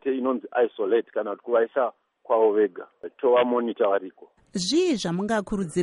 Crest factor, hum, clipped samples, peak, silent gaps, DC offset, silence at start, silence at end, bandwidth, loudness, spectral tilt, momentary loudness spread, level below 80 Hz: 14 dB; none; under 0.1%; -10 dBFS; none; under 0.1%; 0.05 s; 0 s; 11.5 kHz; -24 LUFS; -5 dB/octave; 9 LU; -58 dBFS